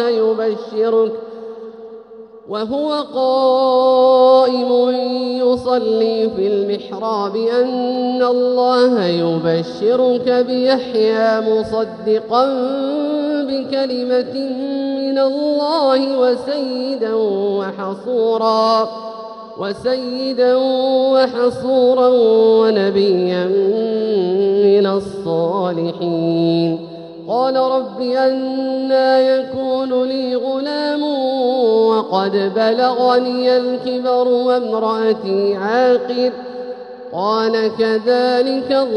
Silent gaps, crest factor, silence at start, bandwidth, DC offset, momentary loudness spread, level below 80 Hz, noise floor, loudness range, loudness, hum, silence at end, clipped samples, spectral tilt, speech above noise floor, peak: none; 14 dB; 0 s; 9.4 kHz; under 0.1%; 8 LU; -60 dBFS; -37 dBFS; 4 LU; -16 LUFS; none; 0 s; under 0.1%; -6.5 dB/octave; 22 dB; -2 dBFS